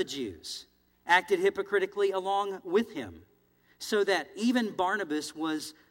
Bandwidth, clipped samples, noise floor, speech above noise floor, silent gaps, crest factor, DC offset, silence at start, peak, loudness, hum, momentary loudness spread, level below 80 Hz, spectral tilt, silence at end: 16.5 kHz; under 0.1%; -66 dBFS; 36 dB; none; 22 dB; under 0.1%; 0 s; -8 dBFS; -29 LUFS; 60 Hz at -70 dBFS; 15 LU; -72 dBFS; -3.5 dB/octave; 0.2 s